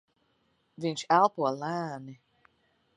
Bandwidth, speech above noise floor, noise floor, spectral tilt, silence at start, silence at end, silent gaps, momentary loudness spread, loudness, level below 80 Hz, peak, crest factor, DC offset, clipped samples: 10.5 kHz; 44 dB; -72 dBFS; -5 dB/octave; 0.8 s; 0.85 s; none; 17 LU; -28 LUFS; -78 dBFS; -10 dBFS; 22 dB; under 0.1%; under 0.1%